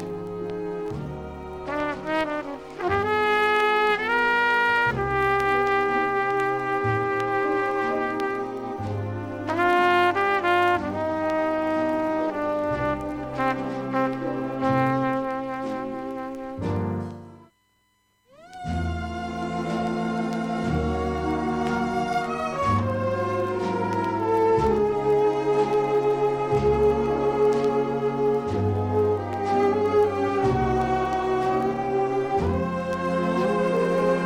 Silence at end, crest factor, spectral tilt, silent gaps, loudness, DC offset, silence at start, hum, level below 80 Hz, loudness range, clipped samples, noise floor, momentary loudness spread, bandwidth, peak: 0 s; 16 dB; -6.5 dB/octave; none; -24 LUFS; under 0.1%; 0 s; none; -44 dBFS; 7 LU; under 0.1%; -67 dBFS; 10 LU; 13 kHz; -8 dBFS